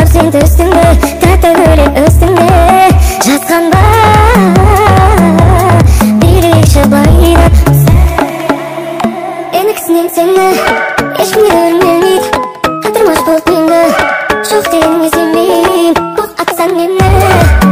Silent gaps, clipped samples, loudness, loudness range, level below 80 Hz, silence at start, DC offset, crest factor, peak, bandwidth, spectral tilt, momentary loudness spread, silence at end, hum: none; 0.9%; -7 LUFS; 4 LU; -14 dBFS; 0 s; under 0.1%; 6 dB; 0 dBFS; 16.5 kHz; -6 dB/octave; 7 LU; 0 s; none